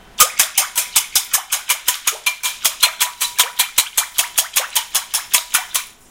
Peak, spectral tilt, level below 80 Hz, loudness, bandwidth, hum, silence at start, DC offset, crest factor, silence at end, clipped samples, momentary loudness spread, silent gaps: 0 dBFS; 3.5 dB/octave; -56 dBFS; -16 LUFS; over 20 kHz; none; 0.15 s; under 0.1%; 20 dB; 0.2 s; under 0.1%; 4 LU; none